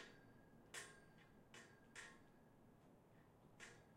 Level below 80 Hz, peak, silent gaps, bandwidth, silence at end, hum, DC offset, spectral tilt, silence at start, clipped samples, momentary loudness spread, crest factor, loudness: -82 dBFS; -42 dBFS; none; 16 kHz; 0 s; none; under 0.1%; -2.5 dB/octave; 0 s; under 0.1%; 12 LU; 22 dB; -61 LUFS